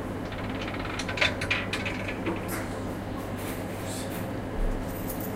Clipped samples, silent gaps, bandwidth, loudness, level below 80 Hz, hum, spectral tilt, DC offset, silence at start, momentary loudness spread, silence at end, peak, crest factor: under 0.1%; none; 16.5 kHz; -31 LUFS; -40 dBFS; none; -4.5 dB/octave; under 0.1%; 0 s; 8 LU; 0 s; -8 dBFS; 22 dB